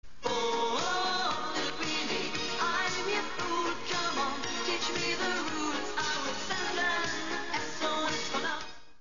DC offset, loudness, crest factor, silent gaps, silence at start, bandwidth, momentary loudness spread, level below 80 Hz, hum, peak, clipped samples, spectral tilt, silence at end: 1%; -31 LUFS; 14 dB; none; 0 s; 7.6 kHz; 4 LU; -60 dBFS; none; -18 dBFS; under 0.1%; -0.5 dB/octave; 0 s